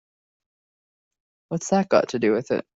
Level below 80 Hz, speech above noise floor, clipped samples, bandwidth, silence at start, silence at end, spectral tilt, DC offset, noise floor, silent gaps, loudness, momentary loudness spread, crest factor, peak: -64 dBFS; over 68 dB; under 0.1%; 8 kHz; 1.5 s; 0.15 s; -5.5 dB/octave; under 0.1%; under -90 dBFS; none; -23 LUFS; 10 LU; 20 dB; -6 dBFS